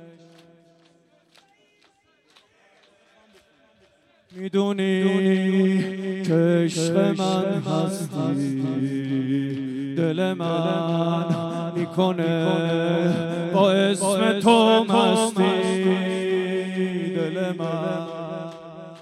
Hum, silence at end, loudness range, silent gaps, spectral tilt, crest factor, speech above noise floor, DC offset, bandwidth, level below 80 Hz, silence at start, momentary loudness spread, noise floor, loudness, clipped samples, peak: none; 0 s; 6 LU; none; -6 dB/octave; 18 dB; 41 dB; under 0.1%; 13 kHz; -72 dBFS; 0 s; 9 LU; -62 dBFS; -22 LUFS; under 0.1%; -4 dBFS